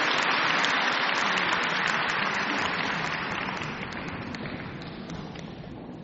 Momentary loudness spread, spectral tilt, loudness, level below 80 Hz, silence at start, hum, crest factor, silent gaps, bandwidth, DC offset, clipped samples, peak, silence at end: 15 LU; -1 dB/octave; -26 LUFS; -56 dBFS; 0 s; none; 20 dB; none; 8 kHz; under 0.1%; under 0.1%; -8 dBFS; 0 s